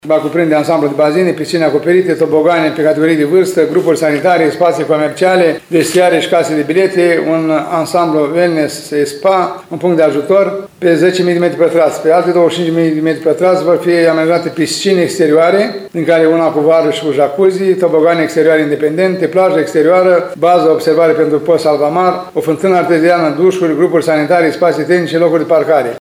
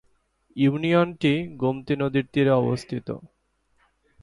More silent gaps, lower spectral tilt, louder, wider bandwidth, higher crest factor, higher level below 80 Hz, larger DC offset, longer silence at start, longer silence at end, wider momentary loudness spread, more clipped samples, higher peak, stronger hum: neither; second, -5.5 dB/octave vs -7.5 dB/octave; first, -11 LUFS vs -23 LUFS; first, 16 kHz vs 11.5 kHz; second, 10 dB vs 16 dB; about the same, -62 dBFS vs -58 dBFS; neither; second, 0.05 s vs 0.55 s; second, 0 s vs 0.95 s; second, 4 LU vs 12 LU; neither; first, 0 dBFS vs -8 dBFS; neither